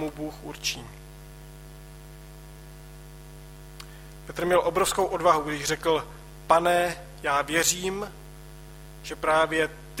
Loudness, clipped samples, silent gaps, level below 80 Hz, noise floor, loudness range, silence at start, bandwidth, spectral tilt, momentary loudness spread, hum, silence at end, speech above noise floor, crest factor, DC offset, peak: -25 LUFS; under 0.1%; none; -48 dBFS; -44 dBFS; 19 LU; 0 s; 16.5 kHz; -3 dB/octave; 23 LU; none; 0 s; 19 dB; 22 dB; under 0.1%; -6 dBFS